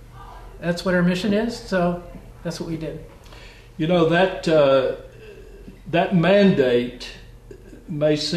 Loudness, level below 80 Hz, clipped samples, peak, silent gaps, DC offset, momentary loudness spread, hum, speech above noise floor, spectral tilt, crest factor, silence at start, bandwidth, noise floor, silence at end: -20 LUFS; -44 dBFS; under 0.1%; -6 dBFS; none; under 0.1%; 23 LU; none; 23 dB; -6.5 dB/octave; 16 dB; 0 s; 13 kHz; -43 dBFS; 0 s